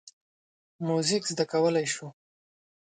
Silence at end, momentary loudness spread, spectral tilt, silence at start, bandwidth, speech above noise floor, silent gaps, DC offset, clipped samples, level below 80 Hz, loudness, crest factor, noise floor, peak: 0.75 s; 11 LU; -4 dB/octave; 0.05 s; 9.4 kHz; over 63 dB; 0.13-0.79 s; under 0.1%; under 0.1%; -78 dBFS; -28 LUFS; 18 dB; under -90 dBFS; -12 dBFS